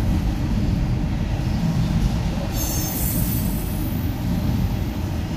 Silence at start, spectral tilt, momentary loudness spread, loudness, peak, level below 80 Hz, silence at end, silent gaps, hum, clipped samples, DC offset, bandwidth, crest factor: 0 s; -6 dB/octave; 3 LU; -23 LUFS; -6 dBFS; -26 dBFS; 0 s; none; none; under 0.1%; under 0.1%; 16 kHz; 14 dB